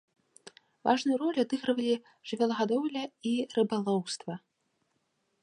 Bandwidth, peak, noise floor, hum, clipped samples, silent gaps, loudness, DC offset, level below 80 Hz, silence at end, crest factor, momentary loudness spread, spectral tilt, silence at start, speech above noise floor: 10.5 kHz; -12 dBFS; -77 dBFS; none; under 0.1%; none; -31 LUFS; under 0.1%; -80 dBFS; 1.05 s; 20 dB; 9 LU; -5 dB/octave; 0.45 s; 47 dB